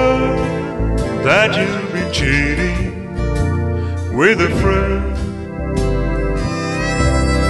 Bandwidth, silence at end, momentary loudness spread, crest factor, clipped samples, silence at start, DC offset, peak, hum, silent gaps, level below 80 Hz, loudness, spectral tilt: 11.5 kHz; 0 s; 9 LU; 14 dB; under 0.1%; 0 s; under 0.1%; -2 dBFS; none; none; -24 dBFS; -17 LUFS; -6 dB/octave